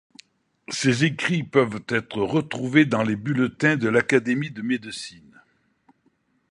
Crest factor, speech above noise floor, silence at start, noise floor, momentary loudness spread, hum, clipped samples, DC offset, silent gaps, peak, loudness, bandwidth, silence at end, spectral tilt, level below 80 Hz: 22 dB; 44 dB; 0.7 s; -67 dBFS; 8 LU; none; under 0.1%; under 0.1%; none; -2 dBFS; -22 LUFS; 11 kHz; 1.4 s; -5.5 dB/octave; -62 dBFS